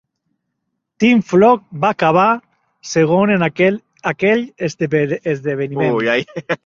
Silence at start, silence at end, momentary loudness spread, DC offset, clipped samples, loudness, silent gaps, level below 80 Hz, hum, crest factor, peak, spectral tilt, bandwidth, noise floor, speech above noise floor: 1 s; 0.1 s; 10 LU; under 0.1%; under 0.1%; -16 LUFS; none; -56 dBFS; none; 14 dB; -2 dBFS; -6 dB/octave; 7.6 kHz; -74 dBFS; 59 dB